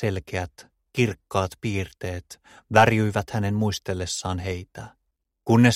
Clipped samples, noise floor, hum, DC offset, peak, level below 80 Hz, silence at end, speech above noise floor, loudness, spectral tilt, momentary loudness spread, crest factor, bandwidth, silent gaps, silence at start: under 0.1%; -77 dBFS; none; under 0.1%; -2 dBFS; -50 dBFS; 0 s; 53 dB; -25 LUFS; -5.5 dB/octave; 19 LU; 22 dB; 15 kHz; none; 0 s